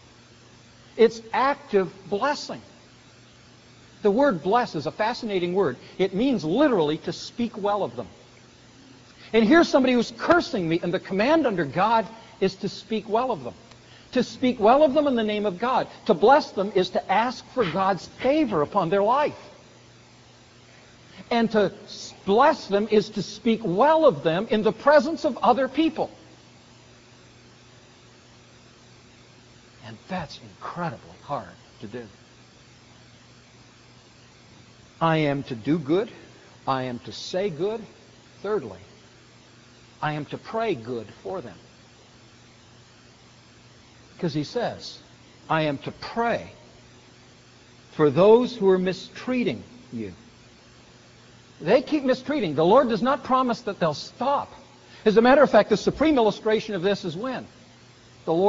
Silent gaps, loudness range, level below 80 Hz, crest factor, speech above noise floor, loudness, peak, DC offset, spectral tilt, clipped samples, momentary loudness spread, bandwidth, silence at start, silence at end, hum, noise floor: none; 14 LU; -58 dBFS; 22 dB; 29 dB; -23 LUFS; -4 dBFS; under 0.1%; -4.5 dB/octave; under 0.1%; 17 LU; 7.6 kHz; 0.95 s; 0 s; none; -52 dBFS